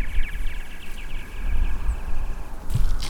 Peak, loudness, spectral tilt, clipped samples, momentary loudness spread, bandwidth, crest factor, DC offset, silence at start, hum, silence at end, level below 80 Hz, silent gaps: -8 dBFS; -32 LUFS; -5 dB/octave; under 0.1%; 9 LU; 11 kHz; 14 dB; under 0.1%; 0 s; none; 0 s; -24 dBFS; none